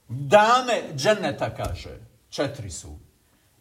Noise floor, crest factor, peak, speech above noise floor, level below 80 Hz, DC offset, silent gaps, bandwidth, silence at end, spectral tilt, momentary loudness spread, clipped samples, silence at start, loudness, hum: -62 dBFS; 20 dB; -4 dBFS; 39 dB; -48 dBFS; under 0.1%; none; 16 kHz; 0.65 s; -4 dB/octave; 20 LU; under 0.1%; 0.1 s; -22 LUFS; none